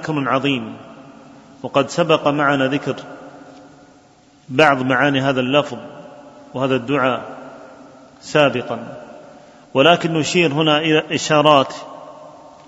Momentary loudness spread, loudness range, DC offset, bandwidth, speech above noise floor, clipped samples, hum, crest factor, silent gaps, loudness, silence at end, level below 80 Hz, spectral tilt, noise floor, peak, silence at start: 23 LU; 5 LU; under 0.1%; 9 kHz; 33 dB; under 0.1%; none; 20 dB; none; -17 LUFS; 0.2 s; -60 dBFS; -5 dB/octave; -50 dBFS; 0 dBFS; 0 s